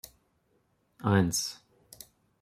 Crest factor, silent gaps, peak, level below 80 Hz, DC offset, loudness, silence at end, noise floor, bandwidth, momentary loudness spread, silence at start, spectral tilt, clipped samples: 22 dB; none; -12 dBFS; -64 dBFS; under 0.1%; -29 LUFS; 0.9 s; -72 dBFS; 16 kHz; 25 LU; 1.05 s; -4.5 dB/octave; under 0.1%